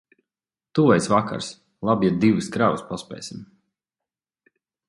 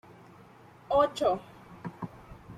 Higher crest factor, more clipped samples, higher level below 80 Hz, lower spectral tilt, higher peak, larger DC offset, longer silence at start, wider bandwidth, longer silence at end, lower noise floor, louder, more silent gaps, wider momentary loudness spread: about the same, 20 dB vs 20 dB; neither; about the same, -58 dBFS vs -60 dBFS; about the same, -6 dB/octave vs -5.5 dB/octave; first, -4 dBFS vs -12 dBFS; neither; second, 0.75 s vs 0.9 s; second, 11.5 kHz vs 13.5 kHz; first, 1.45 s vs 0 s; first, under -90 dBFS vs -54 dBFS; first, -21 LUFS vs -29 LUFS; neither; second, 17 LU vs 21 LU